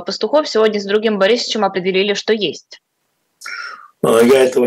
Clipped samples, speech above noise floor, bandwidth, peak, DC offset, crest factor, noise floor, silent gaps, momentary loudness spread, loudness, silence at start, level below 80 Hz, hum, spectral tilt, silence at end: under 0.1%; 53 dB; 16 kHz; 0 dBFS; under 0.1%; 16 dB; -68 dBFS; none; 17 LU; -15 LUFS; 0 s; -64 dBFS; none; -4 dB/octave; 0 s